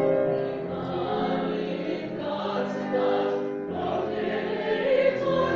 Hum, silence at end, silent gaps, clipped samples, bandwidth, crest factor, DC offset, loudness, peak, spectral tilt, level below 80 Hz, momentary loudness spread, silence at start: none; 0 s; none; under 0.1%; 7 kHz; 16 dB; under 0.1%; -27 LUFS; -10 dBFS; -7.5 dB/octave; -60 dBFS; 7 LU; 0 s